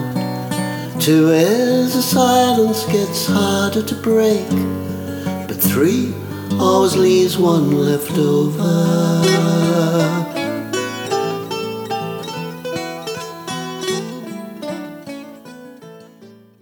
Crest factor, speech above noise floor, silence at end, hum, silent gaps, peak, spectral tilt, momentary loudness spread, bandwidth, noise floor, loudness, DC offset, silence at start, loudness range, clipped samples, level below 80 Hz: 16 dB; 29 dB; 0.3 s; none; none; 0 dBFS; -5.5 dB/octave; 14 LU; over 20 kHz; -44 dBFS; -17 LUFS; under 0.1%; 0 s; 11 LU; under 0.1%; -58 dBFS